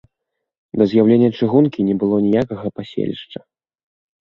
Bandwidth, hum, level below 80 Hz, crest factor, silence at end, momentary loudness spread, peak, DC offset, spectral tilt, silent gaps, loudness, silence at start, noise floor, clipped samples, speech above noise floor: 6 kHz; none; -56 dBFS; 18 dB; 0.9 s; 15 LU; 0 dBFS; under 0.1%; -9.5 dB/octave; none; -17 LUFS; 0.75 s; -79 dBFS; under 0.1%; 63 dB